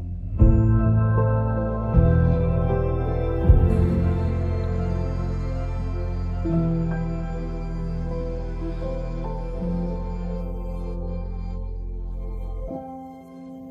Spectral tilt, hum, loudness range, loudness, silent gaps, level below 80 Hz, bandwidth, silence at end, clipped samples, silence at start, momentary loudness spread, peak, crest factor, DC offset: -10.5 dB/octave; none; 10 LU; -25 LUFS; none; -26 dBFS; 5.2 kHz; 0 s; under 0.1%; 0 s; 15 LU; -2 dBFS; 20 dB; under 0.1%